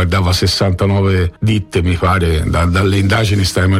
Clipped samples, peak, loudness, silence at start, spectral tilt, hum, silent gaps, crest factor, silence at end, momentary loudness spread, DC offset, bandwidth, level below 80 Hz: under 0.1%; -4 dBFS; -14 LUFS; 0 s; -5.5 dB/octave; none; none; 8 dB; 0 s; 2 LU; under 0.1%; 15 kHz; -26 dBFS